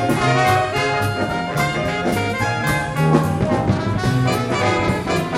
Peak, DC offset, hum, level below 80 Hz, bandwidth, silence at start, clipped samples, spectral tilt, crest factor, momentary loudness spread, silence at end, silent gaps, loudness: -2 dBFS; under 0.1%; none; -38 dBFS; 16 kHz; 0 s; under 0.1%; -6 dB/octave; 18 dB; 4 LU; 0 s; none; -19 LUFS